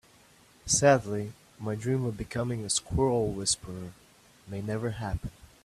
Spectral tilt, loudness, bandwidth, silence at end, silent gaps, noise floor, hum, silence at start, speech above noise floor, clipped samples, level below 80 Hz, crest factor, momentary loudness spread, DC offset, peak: -4 dB/octave; -29 LUFS; 14 kHz; 0.2 s; none; -59 dBFS; none; 0.65 s; 30 dB; under 0.1%; -50 dBFS; 24 dB; 18 LU; under 0.1%; -6 dBFS